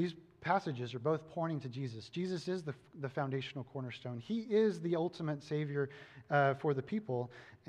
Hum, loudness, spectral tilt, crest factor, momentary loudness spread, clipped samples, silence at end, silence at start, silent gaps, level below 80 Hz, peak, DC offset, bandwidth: none; -37 LUFS; -7.5 dB/octave; 20 dB; 12 LU; under 0.1%; 0.1 s; 0 s; none; -78 dBFS; -16 dBFS; under 0.1%; 10 kHz